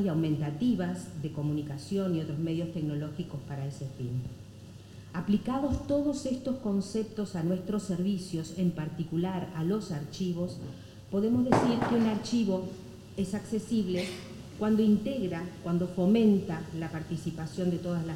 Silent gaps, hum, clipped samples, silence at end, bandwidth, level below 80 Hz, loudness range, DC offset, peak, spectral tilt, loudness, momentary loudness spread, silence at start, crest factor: none; none; under 0.1%; 0 s; 16.5 kHz; -56 dBFS; 5 LU; under 0.1%; -10 dBFS; -7 dB/octave; -31 LUFS; 12 LU; 0 s; 22 dB